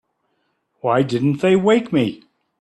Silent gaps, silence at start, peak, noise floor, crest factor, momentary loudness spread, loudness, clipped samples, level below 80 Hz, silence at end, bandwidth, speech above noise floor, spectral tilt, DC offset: none; 0.85 s; -4 dBFS; -69 dBFS; 16 dB; 7 LU; -18 LUFS; under 0.1%; -60 dBFS; 0.45 s; 11.5 kHz; 52 dB; -7 dB/octave; under 0.1%